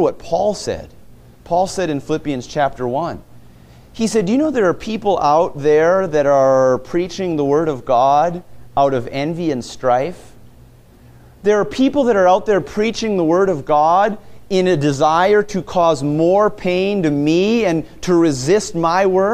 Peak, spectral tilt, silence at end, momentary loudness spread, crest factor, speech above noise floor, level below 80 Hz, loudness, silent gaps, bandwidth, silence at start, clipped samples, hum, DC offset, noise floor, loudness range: -2 dBFS; -6 dB/octave; 0 s; 8 LU; 14 dB; 29 dB; -44 dBFS; -16 LUFS; none; 14.5 kHz; 0 s; under 0.1%; none; under 0.1%; -44 dBFS; 5 LU